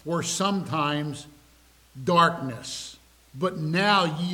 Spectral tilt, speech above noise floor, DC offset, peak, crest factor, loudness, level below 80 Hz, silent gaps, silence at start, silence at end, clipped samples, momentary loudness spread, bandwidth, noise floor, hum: -4.5 dB/octave; 32 dB; under 0.1%; -8 dBFS; 20 dB; -25 LUFS; -60 dBFS; none; 0.05 s; 0 s; under 0.1%; 14 LU; 16.5 kHz; -57 dBFS; none